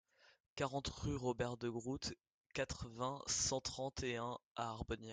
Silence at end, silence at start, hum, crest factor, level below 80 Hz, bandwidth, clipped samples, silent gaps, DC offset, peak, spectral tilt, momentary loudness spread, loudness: 0 s; 0.25 s; none; 18 dB; -60 dBFS; 10 kHz; under 0.1%; 0.40-0.56 s, 2.30-2.50 s, 4.45-4.55 s; under 0.1%; -26 dBFS; -3.5 dB/octave; 8 LU; -43 LUFS